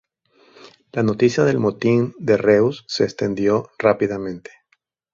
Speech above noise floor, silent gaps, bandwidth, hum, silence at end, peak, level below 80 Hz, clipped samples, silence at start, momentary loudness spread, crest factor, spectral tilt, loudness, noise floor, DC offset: 48 dB; none; 7.6 kHz; none; 0.75 s; -2 dBFS; -56 dBFS; under 0.1%; 0.95 s; 9 LU; 18 dB; -6.5 dB/octave; -19 LUFS; -66 dBFS; under 0.1%